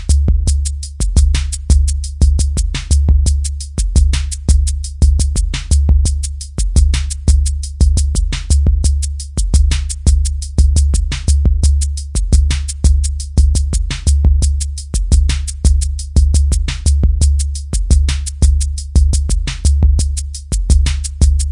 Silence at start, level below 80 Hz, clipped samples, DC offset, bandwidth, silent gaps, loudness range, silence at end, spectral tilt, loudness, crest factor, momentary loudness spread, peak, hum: 0 s; -14 dBFS; under 0.1%; under 0.1%; 11 kHz; none; 1 LU; 0 s; -4.5 dB/octave; -15 LUFS; 12 dB; 6 LU; 0 dBFS; none